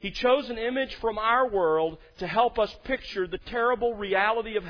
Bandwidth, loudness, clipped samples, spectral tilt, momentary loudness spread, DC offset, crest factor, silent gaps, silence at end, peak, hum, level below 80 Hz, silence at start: 5.4 kHz; -26 LUFS; under 0.1%; -5.5 dB/octave; 8 LU; under 0.1%; 16 dB; none; 0 s; -10 dBFS; none; -50 dBFS; 0 s